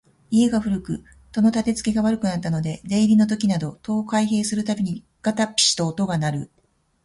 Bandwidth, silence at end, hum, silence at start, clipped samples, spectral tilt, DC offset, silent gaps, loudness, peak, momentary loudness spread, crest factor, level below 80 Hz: 11.5 kHz; 0.6 s; none; 0.3 s; under 0.1%; -4.5 dB/octave; under 0.1%; none; -22 LUFS; -6 dBFS; 9 LU; 16 dB; -52 dBFS